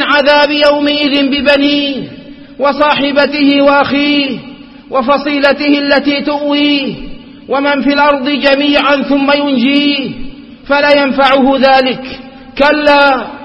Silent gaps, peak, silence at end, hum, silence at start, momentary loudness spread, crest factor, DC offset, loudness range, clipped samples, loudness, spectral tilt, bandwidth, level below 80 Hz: none; 0 dBFS; 0 s; none; 0 s; 10 LU; 10 dB; under 0.1%; 2 LU; 0.2%; -10 LUFS; -5.5 dB/octave; 5.8 kHz; -40 dBFS